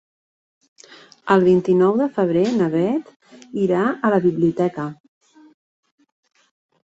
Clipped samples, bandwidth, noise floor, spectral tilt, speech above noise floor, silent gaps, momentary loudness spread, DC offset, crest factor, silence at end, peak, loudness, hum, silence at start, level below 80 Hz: under 0.1%; 7.8 kHz; -47 dBFS; -8 dB/octave; 29 dB; 3.16-3.20 s; 12 LU; under 0.1%; 18 dB; 1.95 s; -2 dBFS; -19 LUFS; none; 1.25 s; -60 dBFS